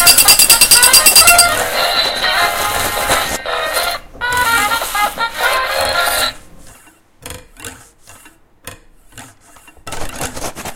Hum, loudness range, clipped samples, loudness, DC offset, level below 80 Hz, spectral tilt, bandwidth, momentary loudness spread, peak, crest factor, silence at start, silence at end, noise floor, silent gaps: none; 21 LU; 0.6%; -10 LUFS; under 0.1%; -36 dBFS; 0.5 dB/octave; over 20 kHz; 24 LU; 0 dBFS; 14 dB; 0 s; 0 s; -45 dBFS; none